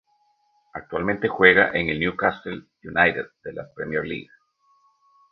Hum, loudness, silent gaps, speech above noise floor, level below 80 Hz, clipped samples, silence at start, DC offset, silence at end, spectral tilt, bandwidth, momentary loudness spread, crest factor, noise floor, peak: none; -21 LUFS; none; 43 dB; -52 dBFS; under 0.1%; 0.75 s; under 0.1%; 1.1 s; -8 dB/octave; 5.6 kHz; 21 LU; 24 dB; -66 dBFS; 0 dBFS